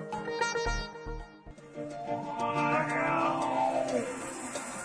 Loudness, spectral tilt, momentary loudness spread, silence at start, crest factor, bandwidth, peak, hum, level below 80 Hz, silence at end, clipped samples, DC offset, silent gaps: -32 LUFS; -4.5 dB/octave; 15 LU; 0 s; 16 dB; 11 kHz; -16 dBFS; none; -48 dBFS; 0 s; under 0.1%; under 0.1%; none